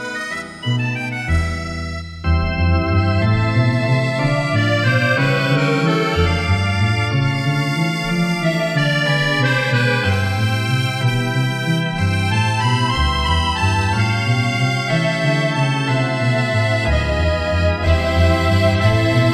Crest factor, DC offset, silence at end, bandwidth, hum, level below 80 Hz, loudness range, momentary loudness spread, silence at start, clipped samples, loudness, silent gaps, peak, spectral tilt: 14 dB; under 0.1%; 0 s; 13.5 kHz; none; -30 dBFS; 2 LU; 4 LU; 0 s; under 0.1%; -17 LUFS; none; -2 dBFS; -6 dB/octave